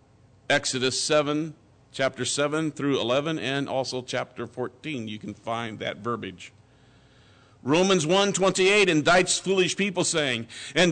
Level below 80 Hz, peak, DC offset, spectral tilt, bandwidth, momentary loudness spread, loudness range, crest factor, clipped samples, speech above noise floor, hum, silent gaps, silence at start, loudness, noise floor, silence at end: -60 dBFS; -12 dBFS; under 0.1%; -3.5 dB/octave; 9.4 kHz; 14 LU; 11 LU; 14 dB; under 0.1%; 32 dB; none; none; 0.5 s; -24 LUFS; -56 dBFS; 0 s